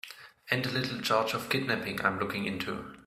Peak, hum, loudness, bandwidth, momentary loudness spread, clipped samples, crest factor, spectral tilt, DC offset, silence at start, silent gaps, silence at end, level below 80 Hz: -10 dBFS; none; -31 LUFS; 16 kHz; 8 LU; under 0.1%; 22 dB; -4.5 dB/octave; under 0.1%; 0.05 s; none; 0.05 s; -64 dBFS